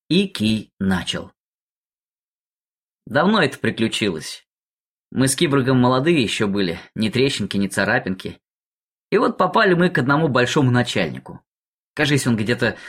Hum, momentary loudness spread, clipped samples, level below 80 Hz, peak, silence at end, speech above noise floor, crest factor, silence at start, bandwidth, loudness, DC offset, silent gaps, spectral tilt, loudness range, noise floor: none; 11 LU; under 0.1%; -52 dBFS; -4 dBFS; 0 s; over 71 dB; 16 dB; 0.1 s; 16 kHz; -19 LUFS; under 0.1%; 0.73-0.77 s, 1.37-2.99 s, 4.47-5.10 s, 8.51-9.09 s, 11.47-11.94 s; -5 dB/octave; 4 LU; under -90 dBFS